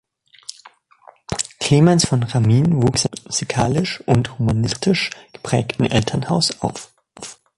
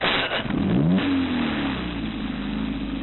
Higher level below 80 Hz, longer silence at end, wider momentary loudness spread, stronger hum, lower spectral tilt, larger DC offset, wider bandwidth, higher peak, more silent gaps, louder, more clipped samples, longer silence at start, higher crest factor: about the same, -44 dBFS vs -40 dBFS; first, 0.25 s vs 0 s; first, 21 LU vs 8 LU; neither; second, -5 dB/octave vs -10.5 dB/octave; second, under 0.1% vs 0.1%; first, 11.5 kHz vs 4.2 kHz; first, -2 dBFS vs -10 dBFS; neither; first, -18 LUFS vs -24 LUFS; neither; first, 0.5 s vs 0 s; about the same, 18 dB vs 14 dB